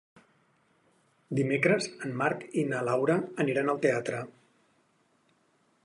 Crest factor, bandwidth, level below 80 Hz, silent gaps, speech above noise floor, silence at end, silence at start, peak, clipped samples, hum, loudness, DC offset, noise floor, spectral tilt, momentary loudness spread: 22 dB; 11.5 kHz; -76 dBFS; none; 41 dB; 1.55 s; 1.3 s; -10 dBFS; under 0.1%; none; -29 LUFS; under 0.1%; -69 dBFS; -6 dB/octave; 9 LU